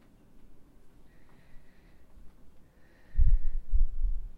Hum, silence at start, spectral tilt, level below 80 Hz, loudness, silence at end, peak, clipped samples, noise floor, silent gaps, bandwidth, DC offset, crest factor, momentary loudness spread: none; 0.35 s; -8.5 dB/octave; -30 dBFS; -34 LUFS; 0.05 s; -10 dBFS; under 0.1%; -55 dBFS; none; 2 kHz; under 0.1%; 16 dB; 8 LU